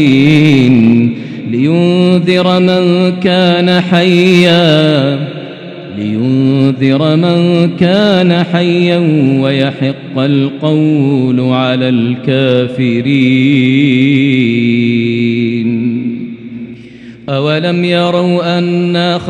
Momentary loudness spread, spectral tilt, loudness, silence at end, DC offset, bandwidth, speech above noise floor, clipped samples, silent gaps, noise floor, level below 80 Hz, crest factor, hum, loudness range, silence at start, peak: 10 LU; -7.5 dB/octave; -10 LUFS; 0 s; under 0.1%; 9.6 kHz; 22 dB; 0.3%; none; -31 dBFS; -54 dBFS; 10 dB; none; 5 LU; 0 s; 0 dBFS